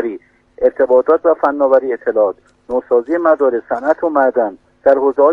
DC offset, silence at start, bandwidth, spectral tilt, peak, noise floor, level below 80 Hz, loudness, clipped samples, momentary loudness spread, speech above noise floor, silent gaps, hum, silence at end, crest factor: under 0.1%; 0 s; 3.8 kHz; -7.5 dB/octave; 0 dBFS; -34 dBFS; -54 dBFS; -15 LUFS; under 0.1%; 10 LU; 20 dB; none; none; 0 s; 14 dB